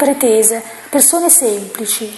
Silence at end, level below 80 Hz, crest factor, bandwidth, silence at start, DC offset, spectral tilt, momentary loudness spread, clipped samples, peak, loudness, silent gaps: 0 s; -62 dBFS; 14 dB; over 20 kHz; 0 s; under 0.1%; -1.5 dB/octave; 10 LU; 0.1%; 0 dBFS; -11 LUFS; none